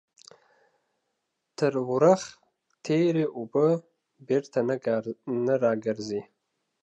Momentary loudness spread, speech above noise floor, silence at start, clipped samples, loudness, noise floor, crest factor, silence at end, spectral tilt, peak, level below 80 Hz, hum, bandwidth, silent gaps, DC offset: 11 LU; 55 dB; 1.6 s; under 0.1%; -26 LUFS; -80 dBFS; 20 dB; 0.6 s; -6.5 dB/octave; -8 dBFS; -76 dBFS; none; 9.6 kHz; none; under 0.1%